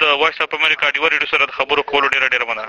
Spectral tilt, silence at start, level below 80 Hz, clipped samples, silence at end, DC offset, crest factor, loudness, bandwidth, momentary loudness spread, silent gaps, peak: -2 dB/octave; 0 s; -54 dBFS; under 0.1%; 0 s; under 0.1%; 16 dB; -15 LUFS; 12 kHz; 2 LU; none; 0 dBFS